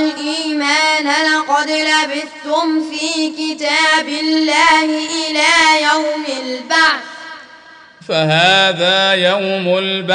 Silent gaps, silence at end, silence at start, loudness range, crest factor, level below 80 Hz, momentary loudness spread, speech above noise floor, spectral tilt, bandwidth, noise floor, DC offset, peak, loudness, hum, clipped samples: none; 0 s; 0 s; 2 LU; 14 dB; -60 dBFS; 10 LU; 26 dB; -3 dB/octave; 10.5 kHz; -40 dBFS; under 0.1%; 0 dBFS; -13 LUFS; none; under 0.1%